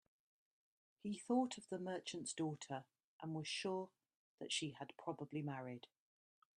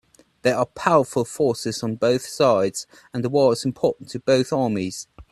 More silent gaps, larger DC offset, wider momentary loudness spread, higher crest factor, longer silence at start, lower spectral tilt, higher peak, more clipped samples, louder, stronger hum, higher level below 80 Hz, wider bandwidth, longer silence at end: first, 3.04-3.20 s, 4.16-4.38 s vs none; neither; first, 13 LU vs 9 LU; about the same, 20 dB vs 20 dB; first, 1.05 s vs 0.45 s; about the same, -4.5 dB/octave vs -5 dB/octave; second, -26 dBFS vs -2 dBFS; neither; second, -45 LUFS vs -22 LUFS; neither; second, -88 dBFS vs -58 dBFS; second, 11 kHz vs 13.5 kHz; first, 0.7 s vs 0.1 s